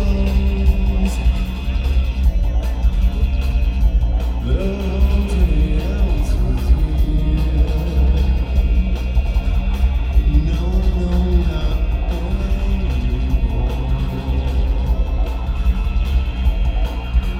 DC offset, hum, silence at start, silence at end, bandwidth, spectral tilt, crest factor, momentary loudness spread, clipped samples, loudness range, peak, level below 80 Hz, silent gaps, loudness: under 0.1%; none; 0 s; 0 s; 7.4 kHz; -7.5 dB/octave; 12 dB; 4 LU; under 0.1%; 2 LU; -4 dBFS; -16 dBFS; none; -19 LUFS